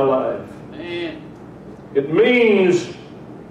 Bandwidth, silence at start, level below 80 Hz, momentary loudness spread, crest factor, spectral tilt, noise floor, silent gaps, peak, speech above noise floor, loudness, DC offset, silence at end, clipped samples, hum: 9.2 kHz; 0 s; -56 dBFS; 24 LU; 14 dB; -6 dB/octave; -37 dBFS; none; -6 dBFS; 22 dB; -17 LUFS; under 0.1%; 0 s; under 0.1%; none